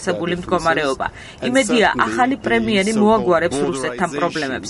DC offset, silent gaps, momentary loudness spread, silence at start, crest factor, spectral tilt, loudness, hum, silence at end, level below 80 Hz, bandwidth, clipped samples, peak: under 0.1%; none; 7 LU; 0 s; 16 dB; -4.5 dB/octave; -18 LUFS; none; 0 s; -46 dBFS; 11.5 kHz; under 0.1%; -2 dBFS